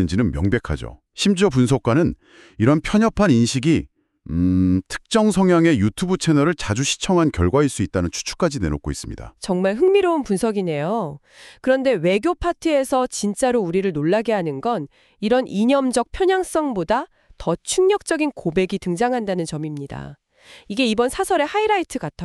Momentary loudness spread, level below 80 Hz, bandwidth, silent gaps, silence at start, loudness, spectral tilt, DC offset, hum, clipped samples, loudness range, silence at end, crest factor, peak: 11 LU; -40 dBFS; 13 kHz; none; 0 s; -20 LUFS; -5.5 dB/octave; under 0.1%; none; under 0.1%; 4 LU; 0 s; 16 dB; -4 dBFS